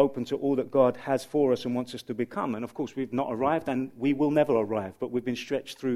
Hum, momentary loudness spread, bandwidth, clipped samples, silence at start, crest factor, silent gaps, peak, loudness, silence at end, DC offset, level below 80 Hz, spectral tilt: none; 9 LU; 14.5 kHz; under 0.1%; 0 s; 18 dB; none; -10 dBFS; -28 LUFS; 0 s; under 0.1%; -64 dBFS; -6.5 dB/octave